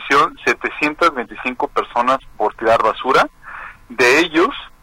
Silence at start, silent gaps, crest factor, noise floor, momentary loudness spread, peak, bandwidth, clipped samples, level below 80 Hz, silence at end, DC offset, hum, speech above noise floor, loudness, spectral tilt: 0 s; none; 14 dB; -35 dBFS; 11 LU; -2 dBFS; 16.5 kHz; under 0.1%; -46 dBFS; 0.15 s; under 0.1%; none; 16 dB; -16 LUFS; -3.5 dB/octave